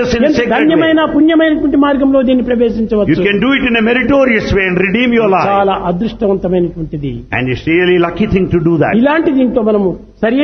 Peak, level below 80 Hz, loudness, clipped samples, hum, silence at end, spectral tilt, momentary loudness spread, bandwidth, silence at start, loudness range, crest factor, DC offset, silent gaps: 0 dBFS; -34 dBFS; -11 LUFS; under 0.1%; none; 0 s; -7 dB/octave; 6 LU; 6.4 kHz; 0 s; 3 LU; 10 dB; under 0.1%; none